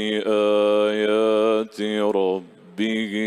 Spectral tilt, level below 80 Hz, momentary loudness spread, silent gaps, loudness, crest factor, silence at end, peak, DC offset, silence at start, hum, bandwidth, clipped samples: -5.5 dB/octave; -72 dBFS; 7 LU; none; -21 LUFS; 12 dB; 0 s; -8 dBFS; under 0.1%; 0 s; none; 12 kHz; under 0.1%